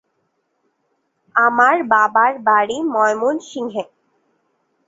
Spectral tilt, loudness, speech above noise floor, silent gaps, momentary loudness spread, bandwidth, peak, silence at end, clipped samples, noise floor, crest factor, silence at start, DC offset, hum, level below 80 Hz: -4 dB/octave; -16 LUFS; 53 dB; none; 13 LU; 8 kHz; -2 dBFS; 1.05 s; under 0.1%; -69 dBFS; 18 dB; 1.35 s; under 0.1%; none; -68 dBFS